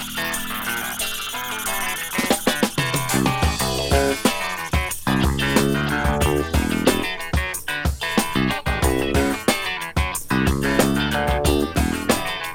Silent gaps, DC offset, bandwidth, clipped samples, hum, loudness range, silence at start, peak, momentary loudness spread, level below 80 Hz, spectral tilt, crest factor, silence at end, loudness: none; under 0.1%; 18.5 kHz; under 0.1%; none; 1 LU; 0 s; -2 dBFS; 5 LU; -30 dBFS; -4 dB/octave; 20 dB; 0 s; -21 LUFS